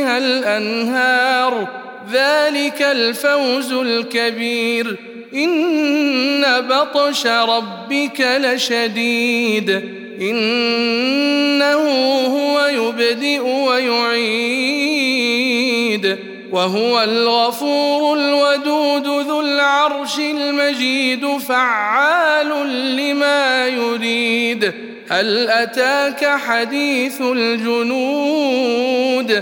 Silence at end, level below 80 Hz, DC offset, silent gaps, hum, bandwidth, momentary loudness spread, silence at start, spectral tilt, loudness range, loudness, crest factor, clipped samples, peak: 0 s; -72 dBFS; under 0.1%; none; none; 17.5 kHz; 5 LU; 0 s; -3 dB/octave; 1 LU; -16 LUFS; 14 dB; under 0.1%; -2 dBFS